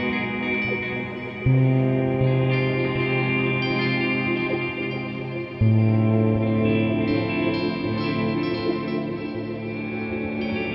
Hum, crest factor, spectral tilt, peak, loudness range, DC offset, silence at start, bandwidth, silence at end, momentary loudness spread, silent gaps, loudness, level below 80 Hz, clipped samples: none; 14 dB; -9.5 dB/octave; -10 dBFS; 3 LU; under 0.1%; 0 s; 5.8 kHz; 0 s; 9 LU; none; -23 LUFS; -46 dBFS; under 0.1%